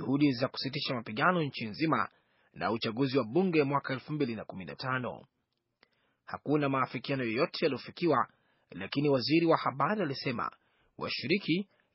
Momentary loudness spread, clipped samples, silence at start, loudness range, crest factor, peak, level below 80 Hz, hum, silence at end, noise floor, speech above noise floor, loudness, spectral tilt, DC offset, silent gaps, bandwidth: 11 LU; under 0.1%; 0 s; 5 LU; 20 dB; -12 dBFS; -72 dBFS; none; 0.3 s; -72 dBFS; 41 dB; -31 LUFS; -4.5 dB/octave; under 0.1%; none; 6 kHz